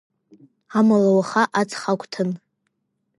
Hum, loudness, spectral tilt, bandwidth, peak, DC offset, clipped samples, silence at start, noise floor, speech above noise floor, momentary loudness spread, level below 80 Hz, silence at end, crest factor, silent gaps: none; -20 LUFS; -6 dB/octave; 11.5 kHz; -4 dBFS; under 0.1%; under 0.1%; 0.7 s; -74 dBFS; 55 dB; 10 LU; -74 dBFS; 0.8 s; 18 dB; none